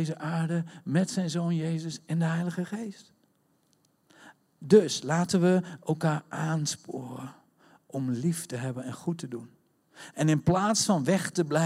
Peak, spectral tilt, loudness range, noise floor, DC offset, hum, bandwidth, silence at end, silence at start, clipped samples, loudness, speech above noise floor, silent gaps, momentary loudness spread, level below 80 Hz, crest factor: -8 dBFS; -5.5 dB/octave; 7 LU; -69 dBFS; under 0.1%; none; 14.5 kHz; 0 s; 0 s; under 0.1%; -28 LUFS; 41 dB; none; 15 LU; -68 dBFS; 22 dB